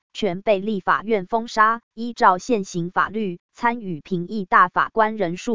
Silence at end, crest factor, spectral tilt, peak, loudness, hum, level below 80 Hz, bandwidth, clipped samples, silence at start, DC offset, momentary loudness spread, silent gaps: 0 s; 20 dB; -5.5 dB/octave; -2 dBFS; -21 LUFS; none; -58 dBFS; 7.6 kHz; under 0.1%; 0.1 s; 0.8%; 11 LU; 1.83-1.91 s, 3.40-3.49 s